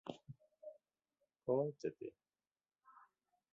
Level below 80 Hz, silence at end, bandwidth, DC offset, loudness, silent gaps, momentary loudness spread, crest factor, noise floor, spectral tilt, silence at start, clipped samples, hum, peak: -86 dBFS; 0.55 s; 7.4 kHz; under 0.1%; -43 LUFS; none; 20 LU; 22 dB; under -90 dBFS; -7.5 dB/octave; 0.05 s; under 0.1%; none; -24 dBFS